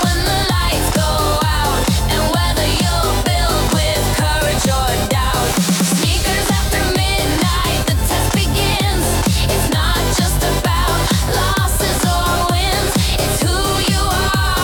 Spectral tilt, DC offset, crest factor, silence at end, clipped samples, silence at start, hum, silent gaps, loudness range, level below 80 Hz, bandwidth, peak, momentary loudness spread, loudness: -4 dB/octave; under 0.1%; 10 dB; 0 s; under 0.1%; 0 s; none; none; 0 LU; -22 dBFS; 19 kHz; -4 dBFS; 1 LU; -16 LUFS